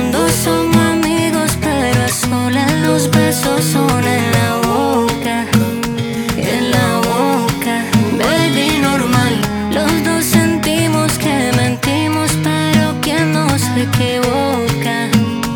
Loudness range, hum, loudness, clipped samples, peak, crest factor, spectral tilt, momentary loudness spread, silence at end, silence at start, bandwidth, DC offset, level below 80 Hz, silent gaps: 1 LU; none; -14 LUFS; under 0.1%; 0 dBFS; 14 dB; -4.5 dB/octave; 3 LU; 0 s; 0 s; over 20 kHz; under 0.1%; -36 dBFS; none